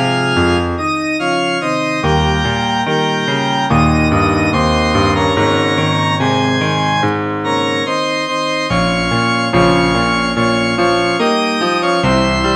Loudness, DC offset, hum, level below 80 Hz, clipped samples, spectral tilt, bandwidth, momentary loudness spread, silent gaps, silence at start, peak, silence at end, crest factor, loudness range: -14 LUFS; under 0.1%; none; -30 dBFS; under 0.1%; -5 dB/octave; 11.5 kHz; 4 LU; none; 0 s; -2 dBFS; 0 s; 12 dB; 2 LU